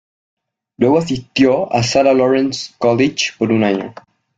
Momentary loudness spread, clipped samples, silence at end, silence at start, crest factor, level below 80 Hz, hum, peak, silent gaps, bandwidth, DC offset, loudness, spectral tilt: 7 LU; under 0.1%; 0.45 s; 0.8 s; 16 dB; -52 dBFS; none; 0 dBFS; none; 8.6 kHz; under 0.1%; -15 LUFS; -5 dB/octave